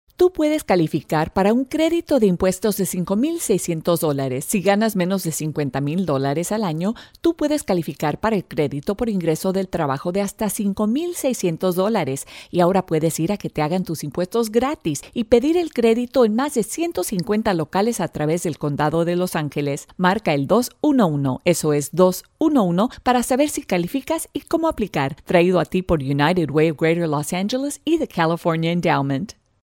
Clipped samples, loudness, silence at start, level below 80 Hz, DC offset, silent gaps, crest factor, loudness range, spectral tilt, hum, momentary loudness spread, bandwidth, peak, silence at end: under 0.1%; -20 LUFS; 0.2 s; -48 dBFS; under 0.1%; none; 20 dB; 3 LU; -5.5 dB/octave; none; 6 LU; 17 kHz; 0 dBFS; 0.35 s